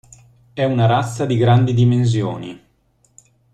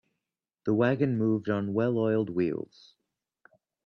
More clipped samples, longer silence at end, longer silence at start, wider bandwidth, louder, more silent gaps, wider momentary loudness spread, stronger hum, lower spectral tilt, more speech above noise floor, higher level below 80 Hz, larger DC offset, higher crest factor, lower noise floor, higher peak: neither; second, 0.95 s vs 1.2 s; about the same, 0.55 s vs 0.65 s; first, 9.2 kHz vs 6.4 kHz; first, -17 LUFS vs -28 LUFS; neither; first, 15 LU vs 9 LU; neither; second, -7.5 dB/octave vs -9.5 dB/octave; second, 44 dB vs 61 dB; first, -48 dBFS vs -68 dBFS; neither; about the same, 16 dB vs 18 dB; second, -60 dBFS vs -88 dBFS; first, -2 dBFS vs -12 dBFS